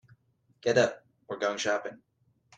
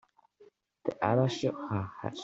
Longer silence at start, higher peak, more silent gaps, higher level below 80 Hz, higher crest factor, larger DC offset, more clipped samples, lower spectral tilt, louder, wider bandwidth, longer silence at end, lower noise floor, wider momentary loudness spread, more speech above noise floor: first, 0.65 s vs 0.4 s; about the same, -10 dBFS vs -12 dBFS; neither; about the same, -72 dBFS vs -68 dBFS; about the same, 22 dB vs 22 dB; neither; neither; second, -3.5 dB/octave vs -6.5 dB/octave; first, -29 LUFS vs -32 LUFS; first, 9.4 kHz vs 7.8 kHz; first, 0.65 s vs 0 s; first, -67 dBFS vs -62 dBFS; first, 17 LU vs 11 LU; first, 39 dB vs 31 dB